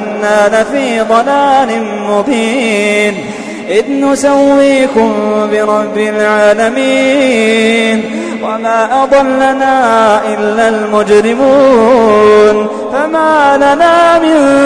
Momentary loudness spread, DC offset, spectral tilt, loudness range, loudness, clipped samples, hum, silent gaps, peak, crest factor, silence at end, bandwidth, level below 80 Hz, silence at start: 7 LU; under 0.1%; -4.5 dB/octave; 3 LU; -9 LUFS; under 0.1%; none; none; 0 dBFS; 8 dB; 0 s; 11 kHz; -44 dBFS; 0 s